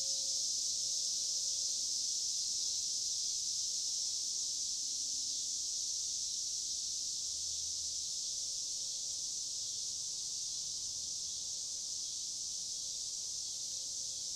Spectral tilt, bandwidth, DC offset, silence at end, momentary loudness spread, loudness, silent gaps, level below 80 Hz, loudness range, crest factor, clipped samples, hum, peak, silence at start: 2.5 dB/octave; 16 kHz; under 0.1%; 0 s; 5 LU; -35 LUFS; none; -74 dBFS; 4 LU; 16 dB; under 0.1%; none; -24 dBFS; 0 s